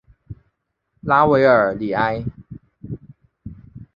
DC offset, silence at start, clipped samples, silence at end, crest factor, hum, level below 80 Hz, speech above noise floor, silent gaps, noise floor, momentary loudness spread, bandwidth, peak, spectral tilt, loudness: under 0.1%; 0.3 s; under 0.1%; 0.1 s; 20 dB; none; -48 dBFS; 55 dB; none; -71 dBFS; 26 LU; 6.8 kHz; -2 dBFS; -9 dB/octave; -17 LUFS